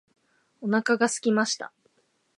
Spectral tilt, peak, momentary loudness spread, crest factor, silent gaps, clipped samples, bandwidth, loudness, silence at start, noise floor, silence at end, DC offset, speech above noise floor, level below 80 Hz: -3.5 dB/octave; -8 dBFS; 12 LU; 20 dB; none; under 0.1%; 11.5 kHz; -25 LUFS; 0.6 s; -70 dBFS; 0.7 s; under 0.1%; 45 dB; -82 dBFS